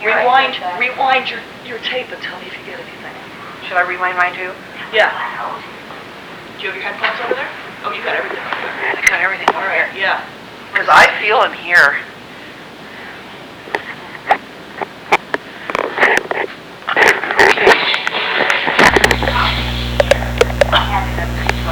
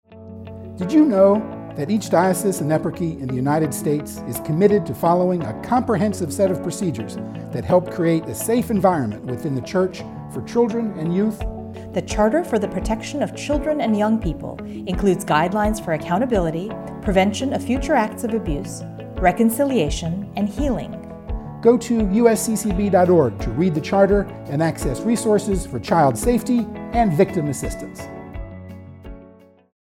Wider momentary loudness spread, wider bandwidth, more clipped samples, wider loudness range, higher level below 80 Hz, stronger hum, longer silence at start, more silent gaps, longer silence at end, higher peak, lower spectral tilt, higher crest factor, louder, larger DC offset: first, 21 LU vs 15 LU; first, over 20 kHz vs 16.5 kHz; neither; first, 9 LU vs 4 LU; about the same, -32 dBFS vs -36 dBFS; neither; about the same, 0 s vs 0.1 s; neither; second, 0 s vs 0.55 s; about the same, 0 dBFS vs -2 dBFS; second, -3.5 dB/octave vs -6 dB/octave; about the same, 16 dB vs 18 dB; first, -14 LUFS vs -20 LUFS; neither